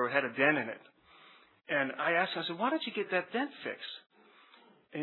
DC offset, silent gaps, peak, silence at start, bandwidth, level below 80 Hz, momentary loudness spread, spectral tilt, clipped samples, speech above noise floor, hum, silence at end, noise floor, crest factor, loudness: under 0.1%; none; -12 dBFS; 0 s; 4.3 kHz; under -90 dBFS; 15 LU; -7.5 dB/octave; under 0.1%; 29 dB; none; 0 s; -62 dBFS; 22 dB; -32 LUFS